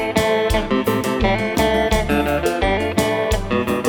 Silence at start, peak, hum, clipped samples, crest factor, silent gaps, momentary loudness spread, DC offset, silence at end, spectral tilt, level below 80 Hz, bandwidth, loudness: 0 s; -2 dBFS; none; under 0.1%; 16 dB; none; 2 LU; under 0.1%; 0 s; -5 dB/octave; -28 dBFS; over 20 kHz; -19 LUFS